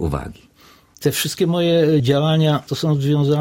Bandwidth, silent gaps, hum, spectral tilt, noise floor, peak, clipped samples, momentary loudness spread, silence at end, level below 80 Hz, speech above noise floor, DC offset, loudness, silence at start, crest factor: 16.5 kHz; none; none; -6 dB/octave; -49 dBFS; -4 dBFS; under 0.1%; 8 LU; 0 s; -42 dBFS; 32 dB; under 0.1%; -18 LUFS; 0 s; 14 dB